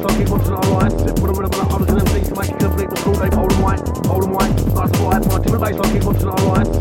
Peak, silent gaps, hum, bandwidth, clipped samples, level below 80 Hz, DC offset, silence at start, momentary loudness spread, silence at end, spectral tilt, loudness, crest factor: -2 dBFS; none; none; 17.5 kHz; under 0.1%; -22 dBFS; under 0.1%; 0 s; 3 LU; 0 s; -6.5 dB/octave; -17 LUFS; 14 dB